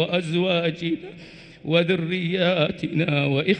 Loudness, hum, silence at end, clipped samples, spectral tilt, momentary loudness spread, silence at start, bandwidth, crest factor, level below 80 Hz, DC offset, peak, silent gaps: -23 LUFS; none; 0 s; under 0.1%; -7 dB/octave; 16 LU; 0 s; 9.2 kHz; 18 dB; -60 dBFS; under 0.1%; -6 dBFS; none